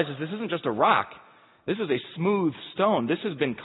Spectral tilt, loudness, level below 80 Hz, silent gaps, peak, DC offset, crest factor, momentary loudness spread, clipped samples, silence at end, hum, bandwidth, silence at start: -10.5 dB/octave; -26 LUFS; -70 dBFS; none; -6 dBFS; under 0.1%; 20 dB; 10 LU; under 0.1%; 0 s; none; 4.1 kHz; 0 s